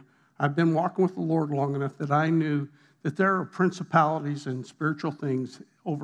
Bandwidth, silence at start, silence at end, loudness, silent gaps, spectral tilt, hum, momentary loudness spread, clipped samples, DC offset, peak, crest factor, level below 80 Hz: 9.2 kHz; 0.4 s; 0 s; -27 LUFS; none; -8 dB/octave; none; 11 LU; under 0.1%; under 0.1%; -8 dBFS; 20 dB; -90 dBFS